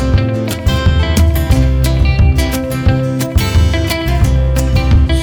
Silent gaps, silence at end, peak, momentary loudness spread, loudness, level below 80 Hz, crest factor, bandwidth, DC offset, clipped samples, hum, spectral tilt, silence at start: none; 0 s; 0 dBFS; 4 LU; -13 LUFS; -14 dBFS; 10 dB; 19.5 kHz; under 0.1%; under 0.1%; none; -6 dB/octave; 0 s